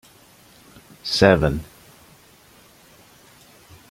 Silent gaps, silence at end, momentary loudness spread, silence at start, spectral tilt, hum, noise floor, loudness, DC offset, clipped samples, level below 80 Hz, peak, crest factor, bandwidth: none; 2.3 s; 19 LU; 1.05 s; -5.5 dB/octave; none; -51 dBFS; -19 LUFS; under 0.1%; under 0.1%; -42 dBFS; -2 dBFS; 24 dB; 16.5 kHz